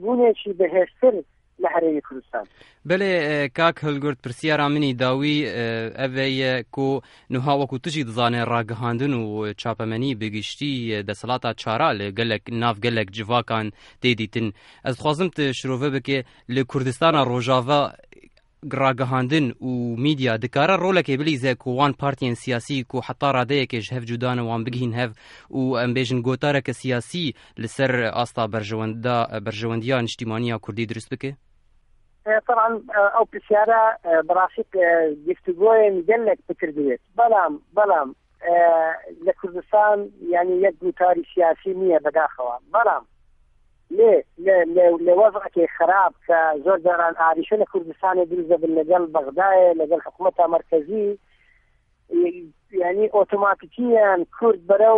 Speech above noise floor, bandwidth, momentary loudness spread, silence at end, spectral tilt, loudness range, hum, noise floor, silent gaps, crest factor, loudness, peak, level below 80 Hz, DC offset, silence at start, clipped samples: 41 dB; 11.5 kHz; 10 LU; 0 s; -6.5 dB/octave; 6 LU; none; -62 dBFS; none; 16 dB; -21 LUFS; -4 dBFS; -58 dBFS; under 0.1%; 0 s; under 0.1%